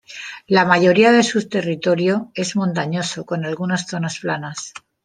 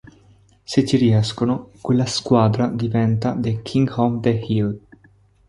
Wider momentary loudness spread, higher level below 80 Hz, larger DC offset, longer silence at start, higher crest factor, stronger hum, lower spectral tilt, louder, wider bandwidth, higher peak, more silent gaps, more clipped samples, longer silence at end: first, 14 LU vs 6 LU; second, -64 dBFS vs -50 dBFS; neither; second, 0.1 s vs 0.7 s; about the same, 18 dB vs 18 dB; neither; second, -5 dB/octave vs -7 dB/octave; about the same, -18 LUFS vs -20 LUFS; second, 10 kHz vs 11.5 kHz; about the same, -2 dBFS vs -2 dBFS; neither; neither; second, 0.25 s vs 0.7 s